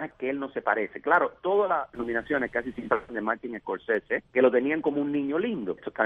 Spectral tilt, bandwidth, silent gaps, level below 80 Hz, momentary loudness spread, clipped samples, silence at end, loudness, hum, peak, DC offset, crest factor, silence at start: -8 dB/octave; 4.5 kHz; none; -62 dBFS; 9 LU; under 0.1%; 0 s; -27 LUFS; none; -8 dBFS; under 0.1%; 20 dB; 0 s